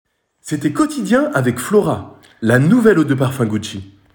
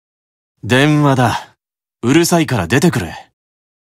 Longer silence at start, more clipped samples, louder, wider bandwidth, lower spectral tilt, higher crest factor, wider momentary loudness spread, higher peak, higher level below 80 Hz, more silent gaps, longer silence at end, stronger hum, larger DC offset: second, 0.45 s vs 0.65 s; neither; about the same, -16 LUFS vs -14 LUFS; first, 18.5 kHz vs 16 kHz; about the same, -6.5 dB/octave vs -5.5 dB/octave; about the same, 14 dB vs 16 dB; about the same, 14 LU vs 14 LU; about the same, -2 dBFS vs 0 dBFS; second, -52 dBFS vs -46 dBFS; neither; second, 0.25 s vs 0.7 s; neither; neither